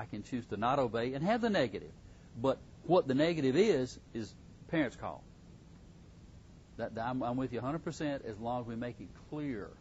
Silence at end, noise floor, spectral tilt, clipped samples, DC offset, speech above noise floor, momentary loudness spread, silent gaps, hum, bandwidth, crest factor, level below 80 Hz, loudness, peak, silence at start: 0.05 s; -55 dBFS; -5.5 dB/octave; under 0.1%; under 0.1%; 21 dB; 15 LU; none; none; 7.6 kHz; 20 dB; -60 dBFS; -35 LUFS; -16 dBFS; 0 s